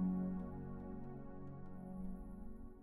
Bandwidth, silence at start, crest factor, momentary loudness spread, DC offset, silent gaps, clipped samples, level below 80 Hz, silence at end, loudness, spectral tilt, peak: 2.4 kHz; 0 s; 14 dB; 11 LU; under 0.1%; none; under 0.1%; -54 dBFS; 0 s; -48 LUFS; -11.5 dB/octave; -30 dBFS